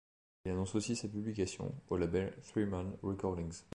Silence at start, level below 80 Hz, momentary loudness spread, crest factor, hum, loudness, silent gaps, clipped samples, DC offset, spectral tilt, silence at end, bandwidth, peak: 0.45 s; -54 dBFS; 5 LU; 18 dB; none; -39 LUFS; none; under 0.1%; under 0.1%; -6 dB/octave; 0.1 s; 11 kHz; -22 dBFS